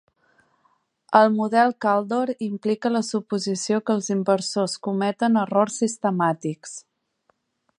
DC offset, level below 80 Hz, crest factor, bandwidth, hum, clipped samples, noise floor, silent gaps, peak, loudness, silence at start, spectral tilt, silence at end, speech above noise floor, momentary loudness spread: under 0.1%; -74 dBFS; 22 dB; 10.5 kHz; none; under 0.1%; -68 dBFS; none; -2 dBFS; -22 LUFS; 1.1 s; -5 dB/octave; 1 s; 47 dB; 8 LU